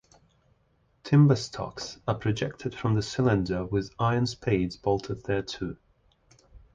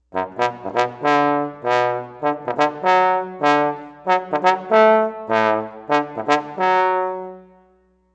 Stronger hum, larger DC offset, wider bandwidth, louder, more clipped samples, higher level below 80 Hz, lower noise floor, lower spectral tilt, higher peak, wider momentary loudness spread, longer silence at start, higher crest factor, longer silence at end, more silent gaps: neither; neither; second, 7.8 kHz vs 8.6 kHz; second, -27 LUFS vs -19 LUFS; neither; first, -50 dBFS vs -66 dBFS; first, -68 dBFS vs -58 dBFS; first, -7 dB/octave vs -5 dB/octave; second, -10 dBFS vs 0 dBFS; first, 13 LU vs 8 LU; first, 1.05 s vs 0.15 s; about the same, 18 dB vs 18 dB; second, 0.15 s vs 0.75 s; neither